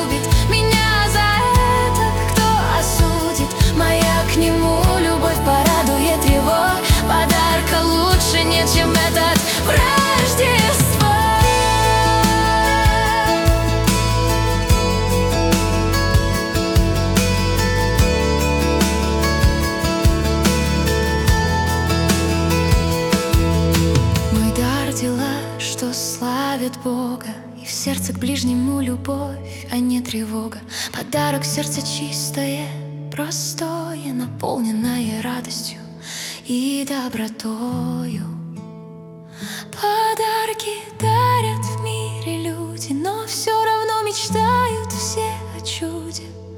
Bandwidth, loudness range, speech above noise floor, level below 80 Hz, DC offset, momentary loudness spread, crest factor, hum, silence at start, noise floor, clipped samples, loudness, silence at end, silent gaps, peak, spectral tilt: 18 kHz; 9 LU; 15 dB; -26 dBFS; under 0.1%; 12 LU; 14 dB; none; 0 s; -37 dBFS; under 0.1%; -18 LUFS; 0 s; none; -2 dBFS; -4.5 dB/octave